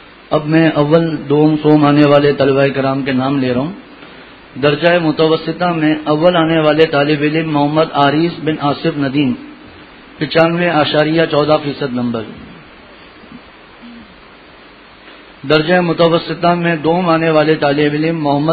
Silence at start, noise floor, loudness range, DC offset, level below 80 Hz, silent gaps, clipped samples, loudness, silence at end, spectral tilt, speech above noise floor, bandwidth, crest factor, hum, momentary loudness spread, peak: 0.3 s; -40 dBFS; 7 LU; under 0.1%; -48 dBFS; none; under 0.1%; -13 LUFS; 0 s; -9 dB/octave; 27 dB; 5 kHz; 14 dB; none; 8 LU; 0 dBFS